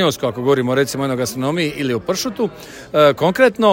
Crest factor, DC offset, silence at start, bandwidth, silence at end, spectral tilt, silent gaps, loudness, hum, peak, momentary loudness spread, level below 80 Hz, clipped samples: 16 dB; under 0.1%; 0 s; 16.5 kHz; 0 s; -5 dB/octave; none; -17 LUFS; none; 0 dBFS; 8 LU; -52 dBFS; under 0.1%